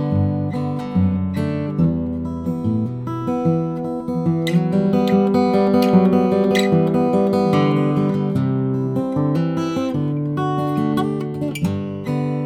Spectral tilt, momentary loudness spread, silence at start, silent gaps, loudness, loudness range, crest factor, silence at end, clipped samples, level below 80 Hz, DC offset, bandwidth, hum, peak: -8 dB/octave; 8 LU; 0 s; none; -19 LUFS; 5 LU; 16 dB; 0 s; under 0.1%; -48 dBFS; under 0.1%; 14.5 kHz; none; -2 dBFS